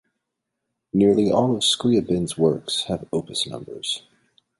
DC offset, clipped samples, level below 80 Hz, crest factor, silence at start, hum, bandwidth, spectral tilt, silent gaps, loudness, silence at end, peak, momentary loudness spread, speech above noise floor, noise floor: under 0.1%; under 0.1%; -54 dBFS; 18 dB; 0.95 s; none; 11.5 kHz; -5 dB/octave; none; -22 LUFS; 0.6 s; -4 dBFS; 10 LU; 59 dB; -81 dBFS